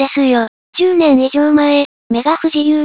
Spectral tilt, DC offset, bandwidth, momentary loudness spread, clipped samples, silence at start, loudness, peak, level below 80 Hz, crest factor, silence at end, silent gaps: -9 dB/octave; 0.2%; 4 kHz; 6 LU; under 0.1%; 0 s; -13 LUFS; 0 dBFS; -54 dBFS; 12 dB; 0 s; 0.48-0.73 s, 1.85-2.10 s